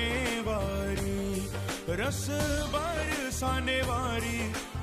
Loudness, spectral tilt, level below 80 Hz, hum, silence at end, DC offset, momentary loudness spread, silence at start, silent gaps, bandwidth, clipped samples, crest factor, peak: -31 LUFS; -4.5 dB/octave; -40 dBFS; none; 0 s; under 0.1%; 4 LU; 0 s; none; 15 kHz; under 0.1%; 14 dB; -18 dBFS